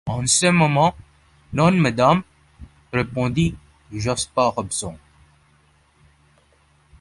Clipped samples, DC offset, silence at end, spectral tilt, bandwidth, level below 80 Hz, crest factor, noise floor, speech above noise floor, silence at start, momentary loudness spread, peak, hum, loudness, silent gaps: under 0.1%; under 0.1%; 2.05 s; -4.5 dB/octave; 11.5 kHz; -46 dBFS; 18 dB; -58 dBFS; 39 dB; 0.05 s; 11 LU; -4 dBFS; none; -20 LUFS; none